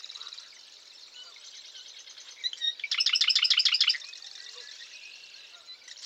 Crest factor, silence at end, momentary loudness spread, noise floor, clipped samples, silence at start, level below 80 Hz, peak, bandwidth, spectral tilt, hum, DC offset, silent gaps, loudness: 22 dB; 0 s; 25 LU; -51 dBFS; under 0.1%; 0 s; under -90 dBFS; -10 dBFS; 16 kHz; 5.5 dB/octave; none; under 0.1%; none; -24 LUFS